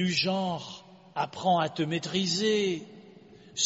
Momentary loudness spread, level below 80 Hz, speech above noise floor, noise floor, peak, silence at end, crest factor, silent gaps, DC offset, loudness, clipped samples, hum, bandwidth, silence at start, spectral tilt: 14 LU; -70 dBFS; 24 dB; -52 dBFS; -12 dBFS; 0 s; 16 dB; none; under 0.1%; -29 LUFS; under 0.1%; none; 8 kHz; 0 s; -3.5 dB/octave